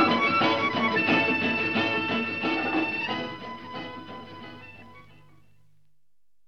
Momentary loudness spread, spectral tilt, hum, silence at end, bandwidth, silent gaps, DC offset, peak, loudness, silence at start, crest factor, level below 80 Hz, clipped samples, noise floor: 20 LU; -5.5 dB/octave; 50 Hz at -60 dBFS; 1.45 s; 7.4 kHz; none; 0.2%; -8 dBFS; -24 LUFS; 0 s; 18 dB; -64 dBFS; under 0.1%; -83 dBFS